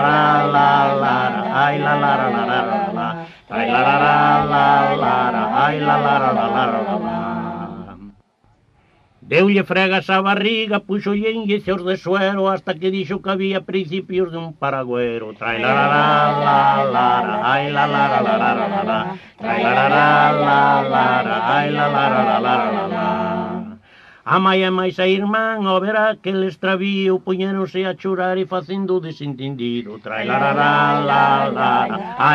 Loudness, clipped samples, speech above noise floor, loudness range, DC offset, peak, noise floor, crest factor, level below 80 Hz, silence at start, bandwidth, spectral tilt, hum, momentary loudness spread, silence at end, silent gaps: -17 LUFS; under 0.1%; 41 dB; 5 LU; under 0.1%; -2 dBFS; -58 dBFS; 16 dB; -56 dBFS; 0 s; 7.2 kHz; -7 dB/octave; none; 10 LU; 0 s; none